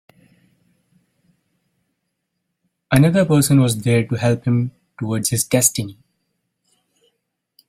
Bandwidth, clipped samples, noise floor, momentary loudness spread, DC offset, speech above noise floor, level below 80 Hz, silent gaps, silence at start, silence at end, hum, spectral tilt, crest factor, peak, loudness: 16.5 kHz; under 0.1%; -76 dBFS; 13 LU; under 0.1%; 59 dB; -52 dBFS; none; 2.9 s; 1.75 s; none; -5 dB/octave; 20 dB; 0 dBFS; -17 LUFS